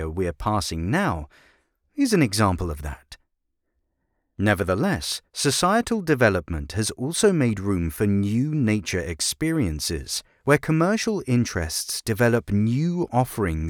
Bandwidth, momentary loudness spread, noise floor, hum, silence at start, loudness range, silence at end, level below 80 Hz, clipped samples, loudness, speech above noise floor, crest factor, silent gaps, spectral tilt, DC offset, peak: 20 kHz; 8 LU; -75 dBFS; none; 0 s; 4 LU; 0 s; -42 dBFS; under 0.1%; -23 LUFS; 53 dB; 20 dB; none; -5 dB/octave; under 0.1%; -4 dBFS